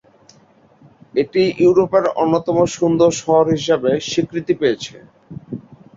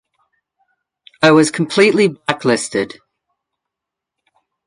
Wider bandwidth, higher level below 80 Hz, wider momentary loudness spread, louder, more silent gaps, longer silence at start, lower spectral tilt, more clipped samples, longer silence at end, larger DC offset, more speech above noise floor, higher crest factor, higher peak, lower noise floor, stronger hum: second, 7.8 kHz vs 11 kHz; first, -54 dBFS vs -62 dBFS; first, 18 LU vs 10 LU; second, -17 LUFS vs -14 LUFS; neither; about the same, 1.15 s vs 1.2 s; about the same, -5.5 dB/octave vs -4.5 dB/octave; neither; second, 0.35 s vs 1.8 s; neither; second, 35 dB vs 69 dB; about the same, 16 dB vs 18 dB; about the same, -2 dBFS vs 0 dBFS; second, -51 dBFS vs -83 dBFS; neither